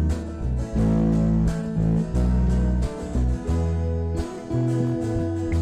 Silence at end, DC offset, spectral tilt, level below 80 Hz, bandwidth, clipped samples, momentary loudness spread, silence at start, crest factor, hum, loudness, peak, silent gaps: 0 s; under 0.1%; -8.5 dB/octave; -28 dBFS; 10 kHz; under 0.1%; 7 LU; 0 s; 8 dB; none; -24 LUFS; -14 dBFS; none